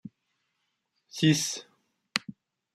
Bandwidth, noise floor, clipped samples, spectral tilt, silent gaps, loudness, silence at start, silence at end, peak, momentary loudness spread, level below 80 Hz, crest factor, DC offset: 15.5 kHz; -79 dBFS; under 0.1%; -4 dB/octave; none; -28 LUFS; 0.05 s; 0.45 s; -6 dBFS; 18 LU; -72 dBFS; 26 dB; under 0.1%